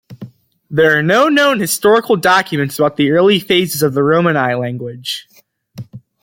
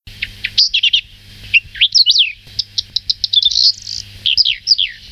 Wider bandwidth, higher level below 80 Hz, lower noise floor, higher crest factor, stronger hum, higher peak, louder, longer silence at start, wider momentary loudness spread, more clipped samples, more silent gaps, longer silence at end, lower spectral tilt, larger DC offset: about the same, 17 kHz vs 16 kHz; second, -56 dBFS vs -44 dBFS; about the same, -37 dBFS vs -37 dBFS; about the same, 14 dB vs 14 dB; neither; about the same, 0 dBFS vs -2 dBFS; about the same, -13 LUFS vs -12 LUFS; about the same, 0.1 s vs 0.05 s; about the same, 12 LU vs 12 LU; neither; neither; first, 0.25 s vs 0 s; first, -4.5 dB/octave vs 2 dB/octave; neither